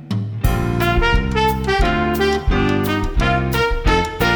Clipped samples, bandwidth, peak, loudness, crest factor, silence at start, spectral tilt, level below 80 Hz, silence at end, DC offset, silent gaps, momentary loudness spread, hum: under 0.1%; over 20 kHz; -2 dBFS; -18 LUFS; 14 dB; 0 s; -6 dB/octave; -22 dBFS; 0 s; under 0.1%; none; 3 LU; none